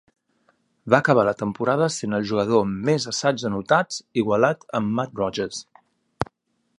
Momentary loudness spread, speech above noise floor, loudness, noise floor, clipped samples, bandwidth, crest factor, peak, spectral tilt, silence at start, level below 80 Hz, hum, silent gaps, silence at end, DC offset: 12 LU; 45 dB; -22 LUFS; -67 dBFS; under 0.1%; 11 kHz; 22 dB; -2 dBFS; -5 dB/octave; 0.85 s; -56 dBFS; none; none; 0.55 s; under 0.1%